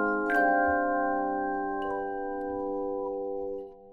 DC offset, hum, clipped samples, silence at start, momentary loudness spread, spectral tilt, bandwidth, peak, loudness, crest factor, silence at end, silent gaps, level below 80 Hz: under 0.1%; none; under 0.1%; 0 s; 10 LU; -7.5 dB/octave; 13 kHz; -12 dBFS; -29 LUFS; 16 dB; 0 s; none; -56 dBFS